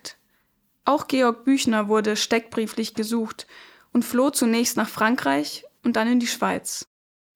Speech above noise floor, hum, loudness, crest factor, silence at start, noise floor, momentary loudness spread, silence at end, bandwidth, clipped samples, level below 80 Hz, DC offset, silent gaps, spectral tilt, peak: 45 dB; none; -23 LUFS; 20 dB; 0.05 s; -68 dBFS; 11 LU; 0.55 s; 18 kHz; under 0.1%; -66 dBFS; under 0.1%; none; -3.5 dB/octave; -4 dBFS